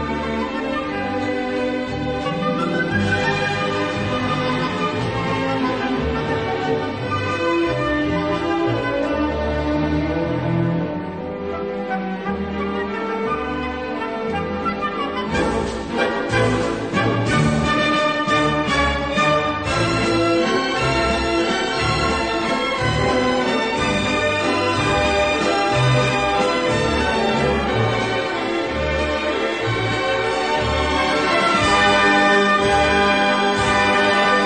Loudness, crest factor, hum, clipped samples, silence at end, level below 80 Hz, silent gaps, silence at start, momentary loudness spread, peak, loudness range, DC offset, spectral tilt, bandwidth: -19 LUFS; 14 dB; none; under 0.1%; 0 s; -36 dBFS; none; 0 s; 8 LU; -4 dBFS; 7 LU; 0.2%; -5 dB/octave; 9.4 kHz